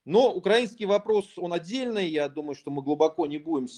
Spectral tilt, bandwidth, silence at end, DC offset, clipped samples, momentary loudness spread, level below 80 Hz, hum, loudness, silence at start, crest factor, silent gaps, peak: -5.5 dB/octave; 10.5 kHz; 0 s; under 0.1%; under 0.1%; 10 LU; -74 dBFS; none; -26 LUFS; 0.05 s; 18 dB; none; -8 dBFS